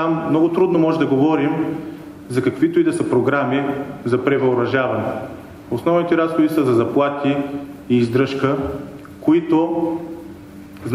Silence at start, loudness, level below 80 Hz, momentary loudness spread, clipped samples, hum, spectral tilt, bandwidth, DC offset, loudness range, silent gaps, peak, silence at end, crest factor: 0 s; -18 LUFS; -52 dBFS; 16 LU; under 0.1%; none; -7.5 dB/octave; 14 kHz; under 0.1%; 2 LU; none; -4 dBFS; 0 s; 14 dB